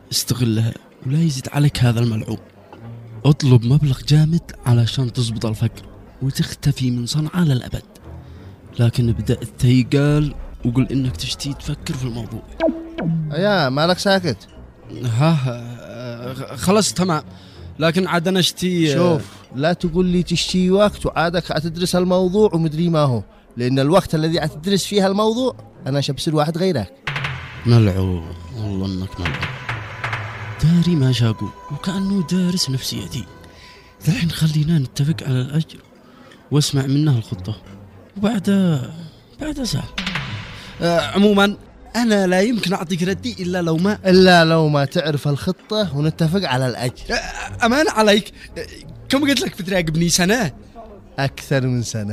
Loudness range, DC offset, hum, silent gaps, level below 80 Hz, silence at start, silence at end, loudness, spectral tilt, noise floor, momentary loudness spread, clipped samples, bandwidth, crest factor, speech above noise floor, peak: 5 LU; under 0.1%; none; none; -42 dBFS; 0.1 s; 0 s; -19 LUFS; -5.5 dB/octave; -45 dBFS; 14 LU; under 0.1%; 16 kHz; 18 dB; 27 dB; 0 dBFS